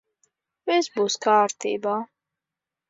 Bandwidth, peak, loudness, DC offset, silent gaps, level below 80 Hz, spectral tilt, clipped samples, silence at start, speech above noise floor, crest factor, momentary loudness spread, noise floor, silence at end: 7.8 kHz; -8 dBFS; -23 LUFS; under 0.1%; none; -80 dBFS; -3 dB/octave; under 0.1%; 0.65 s; 65 dB; 18 dB; 12 LU; -88 dBFS; 0.85 s